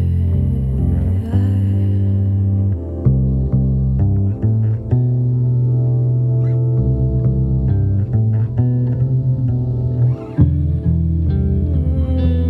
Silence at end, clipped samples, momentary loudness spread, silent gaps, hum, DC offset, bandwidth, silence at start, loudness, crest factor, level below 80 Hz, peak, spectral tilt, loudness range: 0 s; under 0.1%; 2 LU; none; none; under 0.1%; 3.7 kHz; 0 s; -17 LUFS; 14 dB; -24 dBFS; -2 dBFS; -12 dB/octave; 1 LU